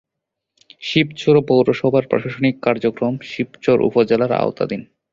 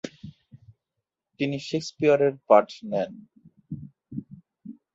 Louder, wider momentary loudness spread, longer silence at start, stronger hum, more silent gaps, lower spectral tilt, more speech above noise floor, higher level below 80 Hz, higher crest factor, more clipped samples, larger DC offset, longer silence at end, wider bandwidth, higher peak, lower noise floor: first, -18 LUFS vs -24 LUFS; second, 9 LU vs 26 LU; first, 0.8 s vs 0.05 s; neither; neither; about the same, -7 dB/octave vs -6 dB/octave; about the same, 64 dB vs 61 dB; first, -56 dBFS vs -66 dBFS; second, 16 dB vs 24 dB; neither; neither; about the same, 0.3 s vs 0.25 s; about the same, 7.6 kHz vs 8 kHz; about the same, -2 dBFS vs -4 dBFS; second, -81 dBFS vs -85 dBFS